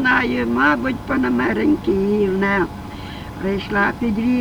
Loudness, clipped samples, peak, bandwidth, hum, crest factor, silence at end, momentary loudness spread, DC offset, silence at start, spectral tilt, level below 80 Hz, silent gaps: -19 LUFS; under 0.1%; -4 dBFS; 19.5 kHz; none; 16 dB; 0 s; 10 LU; under 0.1%; 0 s; -7 dB/octave; -38 dBFS; none